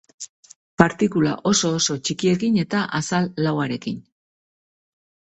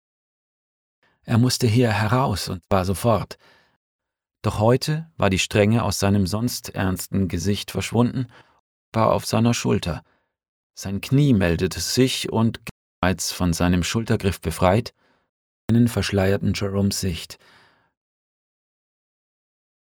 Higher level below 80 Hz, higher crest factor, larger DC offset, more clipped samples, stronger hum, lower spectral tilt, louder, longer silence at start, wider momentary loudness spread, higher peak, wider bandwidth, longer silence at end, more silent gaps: second, -56 dBFS vs -44 dBFS; about the same, 22 dB vs 20 dB; neither; neither; neither; about the same, -4.5 dB/octave vs -5.5 dB/octave; about the same, -21 LUFS vs -22 LUFS; second, 0.2 s vs 1.25 s; first, 17 LU vs 10 LU; about the same, 0 dBFS vs -2 dBFS; second, 8.4 kHz vs 19 kHz; second, 1.4 s vs 2.55 s; second, 0.29-0.43 s, 0.56-0.77 s vs 3.76-3.99 s, 8.60-8.92 s, 10.48-10.70 s, 12.71-13.02 s, 15.29-15.68 s